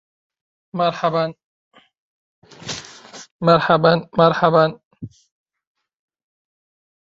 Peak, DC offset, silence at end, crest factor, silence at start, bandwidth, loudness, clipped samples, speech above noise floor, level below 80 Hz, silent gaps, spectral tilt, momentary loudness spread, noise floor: -2 dBFS; under 0.1%; 1.95 s; 20 dB; 0.75 s; 8 kHz; -17 LUFS; under 0.1%; 25 dB; -58 dBFS; 1.44-1.71 s, 1.98-2.42 s, 3.31-3.39 s, 4.85-4.91 s; -6 dB/octave; 24 LU; -41 dBFS